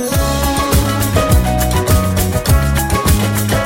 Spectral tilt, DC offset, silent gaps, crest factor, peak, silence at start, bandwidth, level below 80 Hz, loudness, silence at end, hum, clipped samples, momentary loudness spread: -5 dB/octave; under 0.1%; none; 14 dB; 0 dBFS; 0 s; 17 kHz; -18 dBFS; -14 LUFS; 0 s; none; under 0.1%; 2 LU